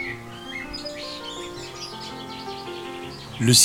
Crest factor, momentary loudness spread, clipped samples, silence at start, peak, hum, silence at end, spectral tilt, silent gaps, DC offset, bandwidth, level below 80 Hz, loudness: 22 dB; 6 LU; under 0.1%; 0 s; -4 dBFS; none; 0 s; -2.5 dB/octave; none; under 0.1%; 17 kHz; -52 dBFS; -30 LUFS